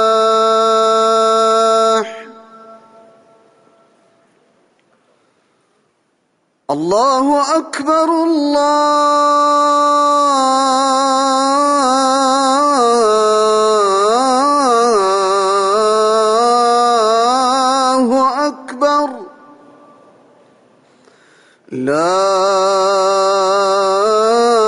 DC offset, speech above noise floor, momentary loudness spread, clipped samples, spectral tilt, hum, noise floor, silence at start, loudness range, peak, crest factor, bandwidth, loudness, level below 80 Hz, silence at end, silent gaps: under 0.1%; 50 dB; 4 LU; under 0.1%; -3 dB/octave; none; -63 dBFS; 0 s; 8 LU; -4 dBFS; 10 dB; 11 kHz; -13 LUFS; -62 dBFS; 0 s; none